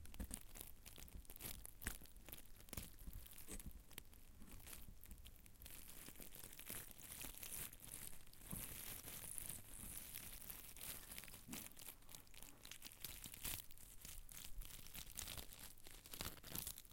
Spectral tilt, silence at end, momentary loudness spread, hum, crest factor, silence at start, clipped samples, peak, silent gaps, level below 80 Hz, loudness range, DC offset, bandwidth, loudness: -2 dB/octave; 0 s; 10 LU; none; 28 dB; 0 s; under 0.1%; -28 dBFS; none; -62 dBFS; 6 LU; under 0.1%; 17 kHz; -53 LUFS